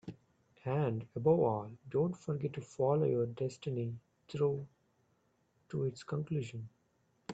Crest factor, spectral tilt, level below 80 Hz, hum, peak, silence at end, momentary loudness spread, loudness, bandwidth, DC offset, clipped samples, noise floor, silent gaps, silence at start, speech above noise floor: 20 dB; -8.5 dB/octave; -72 dBFS; none; -16 dBFS; 0 s; 16 LU; -36 LUFS; 8.2 kHz; under 0.1%; under 0.1%; -75 dBFS; none; 0.05 s; 41 dB